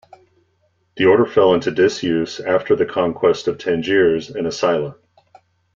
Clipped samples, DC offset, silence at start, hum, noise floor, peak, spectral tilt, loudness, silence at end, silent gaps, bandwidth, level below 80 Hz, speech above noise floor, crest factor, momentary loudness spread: under 0.1%; under 0.1%; 0.95 s; none; -64 dBFS; -2 dBFS; -5.5 dB/octave; -17 LUFS; 0.85 s; none; 7.6 kHz; -56 dBFS; 47 dB; 16 dB; 7 LU